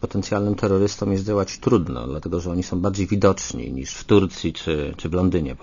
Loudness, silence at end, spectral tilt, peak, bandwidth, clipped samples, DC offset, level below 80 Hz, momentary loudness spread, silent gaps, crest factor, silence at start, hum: -22 LUFS; 0.05 s; -6 dB/octave; -4 dBFS; 7.4 kHz; under 0.1%; under 0.1%; -40 dBFS; 9 LU; none; 18 dB; 0 s; none